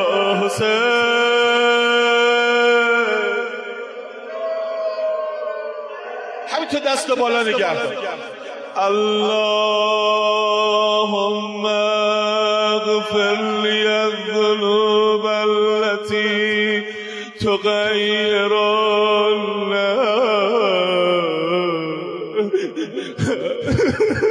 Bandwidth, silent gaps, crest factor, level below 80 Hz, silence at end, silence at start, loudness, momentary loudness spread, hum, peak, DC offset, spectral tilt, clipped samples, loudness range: 11 kHz; none; 12 dB; -54 dBFS; 0 s; 0 s; -18 LUFS; 12 LU; none; -6 dBFS; under 0.1%; -4 dB/octave; under 0.1%; 5 LU